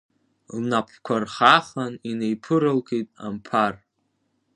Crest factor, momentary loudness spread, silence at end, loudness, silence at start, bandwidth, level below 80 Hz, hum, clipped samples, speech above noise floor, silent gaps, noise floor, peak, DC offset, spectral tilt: 24 dB; 14 LU; 0.8 s; -23 LUFS; 0.5 s; 11 kHz; -66 dBFS; none; under 0.1%; 49 dB; none; -72 dBFS; 0 dBFS; under 0.1%; -5.5 dB/octave